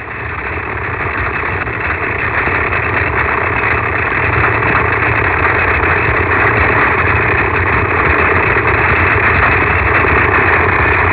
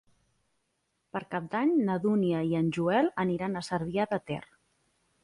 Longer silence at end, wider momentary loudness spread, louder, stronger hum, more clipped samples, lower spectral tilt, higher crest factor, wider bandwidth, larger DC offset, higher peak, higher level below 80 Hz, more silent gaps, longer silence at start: second, 0 s vs 0.8 s; second, 7 LU vs 11 LU; first, -12 LUFS vs -29 LUFS; neither; neither; first, -9.5 dB/octave vs -7.5 dB/octave; about the same, 12 dB vs 16 dB; second, 4 kHz vs 11.5 kHz; first, 0.5% vs under 0.1%; first, 0 dBFS vs -16 dBFS; first, -24 dBFS vs -66 dBFS; neither; second, 0 s vs 1.15 s